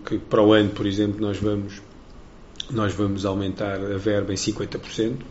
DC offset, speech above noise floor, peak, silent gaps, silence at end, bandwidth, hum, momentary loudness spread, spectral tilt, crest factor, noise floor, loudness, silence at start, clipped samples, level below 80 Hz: under 0.1%; 21 dB; -4 dBFS; none; 0 s; 8 kHz; none; 12 LU; -5.5 dB/octave; 20 dB; -44 dBFS; -23 LUFS; 0 s; under 0.1%; -46 dBFS